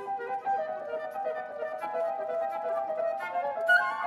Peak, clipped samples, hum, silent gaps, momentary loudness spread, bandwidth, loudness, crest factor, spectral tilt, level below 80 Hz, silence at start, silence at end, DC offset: -12 dBFS; under 0.1%; none; none; 11 LU; 13.5 kHz; -31 LUFS; 18 dB; -3 dB/octave; -82 dBFS; 0 s; 0 s; under 0.1%